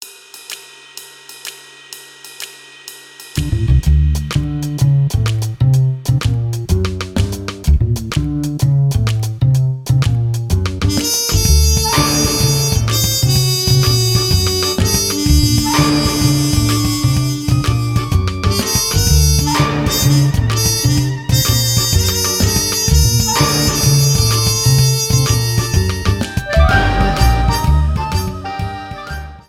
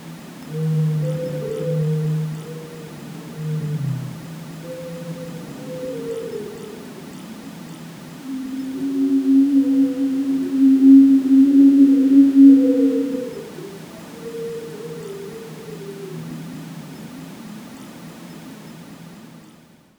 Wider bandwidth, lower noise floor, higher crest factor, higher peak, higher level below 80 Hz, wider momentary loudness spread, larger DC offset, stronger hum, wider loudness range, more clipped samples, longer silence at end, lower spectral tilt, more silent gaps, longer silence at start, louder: first, 17 kHz vs 12 kHz; second, -36 dBFS vs -49 dBFS; about the same, 14 dB vs 18 dB; about the same, 0 dBFS vs -2 dBFS; first, -22 dBFS vs -60 dBFS; second, 16 LU vs 25 LU; neither; neither; second, 4 LU vs 22 LU; neither; second, 0.1 s vs 0.6 s; second, -4 dB/octave vs -8 dB/octave; neither; about the same, 0 s vs 0 s; about the same, -14 LUFS vs -16 LUFS